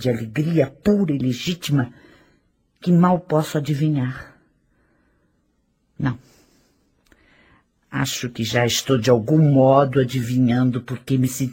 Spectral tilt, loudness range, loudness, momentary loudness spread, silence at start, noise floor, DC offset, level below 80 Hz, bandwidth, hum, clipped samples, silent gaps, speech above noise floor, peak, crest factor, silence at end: -6 dB/octave; 16 LU; -20 LUFS; 11 LU; 0 s; -66 dBFS; under 0.1%; -54 dBFS; 16.5 kHz; none; under 0.1%; none; 48 dB; -2 dBFS; 20 dB; 0 s